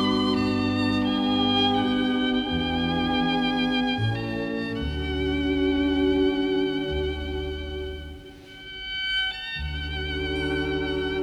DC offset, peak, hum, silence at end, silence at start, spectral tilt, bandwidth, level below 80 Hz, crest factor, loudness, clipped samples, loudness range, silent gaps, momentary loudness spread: under 0.1%; -10 dBFS; none; 0 s; 0 s; -6.5 dB/octave; 10.5 kHz; -38 dBFS; 14 dB; -25 LUFS; under 0.1%; 6 LU; none; 10 LU